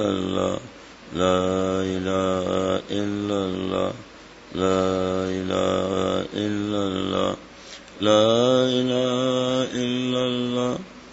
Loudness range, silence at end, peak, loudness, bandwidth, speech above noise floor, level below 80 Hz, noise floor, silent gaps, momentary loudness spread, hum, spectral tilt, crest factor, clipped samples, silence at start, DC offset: 4 LU; 0 s; -4 dBFS; -23 LUFS; 8 kHz; 20 dB; -56 dBFS; -42 dBFS; none; 13 LU; none; -5.5 dB/octave; 18 dB; under 0.1%; 0 s; under 0.1%